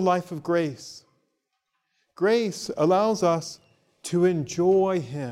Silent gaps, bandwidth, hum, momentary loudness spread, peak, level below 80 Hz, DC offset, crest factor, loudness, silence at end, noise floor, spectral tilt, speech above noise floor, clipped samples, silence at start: none; 13.5 kHz; none; 12 LU; -10 dBFS; -68 dBFS; under 0.1%; 16 dB; -24 LUFS; 0 s; -78 dBFS; -6 dB/octave; 54 dB; under 0.1%; 0 s